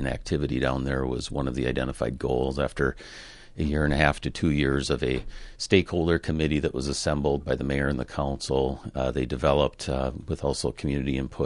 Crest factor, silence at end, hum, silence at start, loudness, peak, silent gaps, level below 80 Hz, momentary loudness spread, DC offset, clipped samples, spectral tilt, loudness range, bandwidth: 22 dB; 0 s; none; 0 s; -27 LUFS; -4 dBFS; none; -36 dBFS; 7 LU; under 0.1%; under 0.1%; -5.5 dB/octave; 3 LU; 11.5 kHz